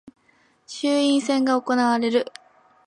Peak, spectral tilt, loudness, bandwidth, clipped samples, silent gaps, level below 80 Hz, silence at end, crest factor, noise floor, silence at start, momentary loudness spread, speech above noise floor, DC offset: -8 dBFS; -3.5 dB/octave; -21 LUFS; 11 kHz; under 0.1%; none; -76 dBFS; 0.6 s; 14 dB; -61 dBFS; 0.05 s; 9 LU; 40 dB; under 0.1%